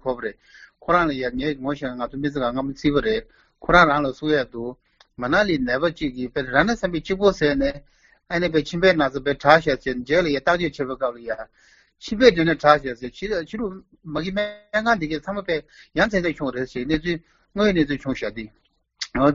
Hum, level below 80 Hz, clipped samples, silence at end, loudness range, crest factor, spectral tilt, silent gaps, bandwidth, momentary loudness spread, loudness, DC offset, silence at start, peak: none; -44 dBFS; under 0.1%; 0 s; 4 LU; 22 dB; -3.5 dB/octave; none; 7.6 kHz; 15 LU; -22 LUFS; under 0.1%; 0.05 s; 0 dBFS